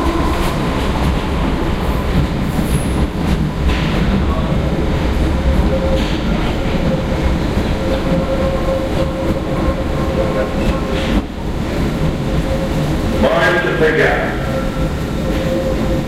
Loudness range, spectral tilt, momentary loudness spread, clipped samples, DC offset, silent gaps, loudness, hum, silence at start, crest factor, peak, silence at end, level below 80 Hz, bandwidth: 2 LU; -6.5 dB/octave; 5 LU; under 0.1%; under 0.1%; none; -17 LUFS; none; 0 s; 14 dB; -2 dBFS; 0 s; -20 dBFS; 15.5 kHz